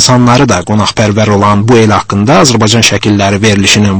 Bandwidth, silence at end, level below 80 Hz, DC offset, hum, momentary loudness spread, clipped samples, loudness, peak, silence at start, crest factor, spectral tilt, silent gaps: 11 kHz; 0 s; -34 dBFS; under 0.1%; none; 3 LU; 3%; -7 LUFS; 0 dBFS; 0 s; 6 dB; -4.5 dB/octave; none